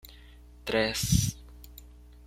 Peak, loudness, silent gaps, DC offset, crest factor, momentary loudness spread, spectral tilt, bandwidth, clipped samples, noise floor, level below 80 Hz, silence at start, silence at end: -10 dBFS; -28 LUFS; none; under 0.1%; 22 dB; 24 LU; -4 dB/octave; 16.5 kHz; under 0.1%; -51 dBFS; -42 dBFS; 0.05 s; 0.05 s